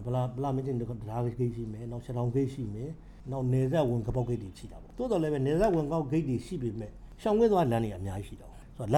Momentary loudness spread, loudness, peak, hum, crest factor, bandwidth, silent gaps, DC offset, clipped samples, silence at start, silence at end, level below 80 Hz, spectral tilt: 15 LU; -31 LUFS; -14 dBFS; none; 18 dB; 12.5 kHz; none; under 0.1%; under 0.1%; 0 s; 0 s; -48 dBFS; -8.5 dB/octave